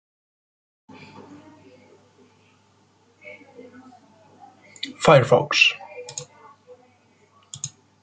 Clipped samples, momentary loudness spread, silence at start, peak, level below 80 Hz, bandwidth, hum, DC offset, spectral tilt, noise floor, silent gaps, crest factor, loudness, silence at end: under 0.1%; 29 LU; 3.25 s; -2 dBFS; -60 dBFS; 9.4 kHz; none; under 0.1%; -4 dB/octave; -60 dBFS; none; 24 dB; -19 LUFS; 0.35 s